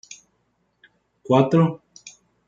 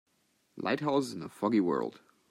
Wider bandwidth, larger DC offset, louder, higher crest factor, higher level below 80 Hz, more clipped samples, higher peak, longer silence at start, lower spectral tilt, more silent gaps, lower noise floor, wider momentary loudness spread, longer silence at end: second, 7.6 kHz vs 15 kHz; neither; first, -19 LUFS vs -32 LUFS; about the same, 20 dB vs 16 dB; first, -66 dBFS vs -76 dBFS; neither; first, -4 dBFS vs -16 dBFS; first, 1.3 s vs 0.55 s; first, -7.5 dB/octave vs -6 dB/octave; neither; second, -69 dBFS vs -73 dBFS; first, 26 LU vs 10 LU; about the same, 0.4 s vs 0.35 s